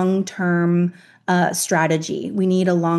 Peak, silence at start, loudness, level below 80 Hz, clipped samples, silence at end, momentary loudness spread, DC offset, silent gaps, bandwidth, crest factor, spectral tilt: -4 dBFS; 0 s; -19 LUFS; -70 dBFS; under 0.1%; 0 s; 6 LU; under 0.1%; none; 12.5 kHz; 14 dB; -5.5 dB/octave